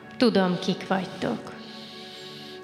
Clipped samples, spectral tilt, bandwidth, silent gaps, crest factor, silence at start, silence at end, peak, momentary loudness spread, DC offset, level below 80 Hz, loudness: under 0.1%; -6 dB/octave; 13 kHz; none; 20 dB; 0 s; 0 s; -8 dBFS; 18 LU; under 0.1%; -68 dBFS; -26 LUFS